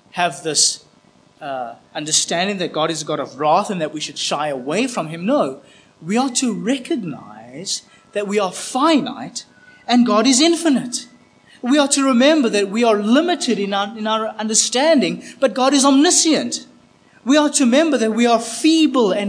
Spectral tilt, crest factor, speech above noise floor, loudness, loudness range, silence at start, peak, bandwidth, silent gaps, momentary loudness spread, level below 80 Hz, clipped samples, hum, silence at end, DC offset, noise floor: -3 dB/octave; 18 dB; 35 dB; -17 LUFS; 6 LU; 0.15 s; 0 dBFS; 10.5 kHz; none; 14 LU; -72 dBFS; under 0.1%; none; 0 s; under 0.1%; -52 dBFS